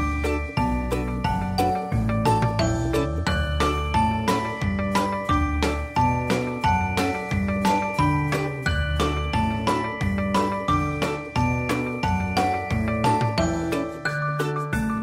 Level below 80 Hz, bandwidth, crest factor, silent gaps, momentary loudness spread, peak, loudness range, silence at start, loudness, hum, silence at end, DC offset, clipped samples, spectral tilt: -34 dBFS; 16 kHz; 14 dB; none; 4 LU; -10 dBFS; 1 LU; 0 s; -24 LUFS; none; 0 s; under 0.1%; under 0.1%; -6 dB/octave